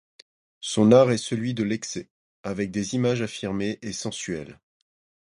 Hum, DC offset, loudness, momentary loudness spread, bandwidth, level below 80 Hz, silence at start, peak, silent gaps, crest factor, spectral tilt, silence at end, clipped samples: none; under 0.1%; -24 LUFS; 17 LU; 11.5 kHz; -58 dBFS; 0.6 s; -4 dBFS; 2.10-2.44 s; 22 dB; -5.5 dB/octave; 0.8 s; under 0.1%